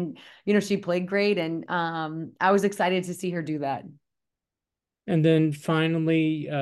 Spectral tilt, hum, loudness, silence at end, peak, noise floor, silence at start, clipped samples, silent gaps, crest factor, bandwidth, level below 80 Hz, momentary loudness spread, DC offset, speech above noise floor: -6.5 dB/octave; none; -25 LUFS; 0 s; -8 dBFS; -89 dBFS; 0 s; under 0.1%; none; 18 dB; 12.5 kHz; -72 dBFS; 10 LU; under 0.1%; 64 dB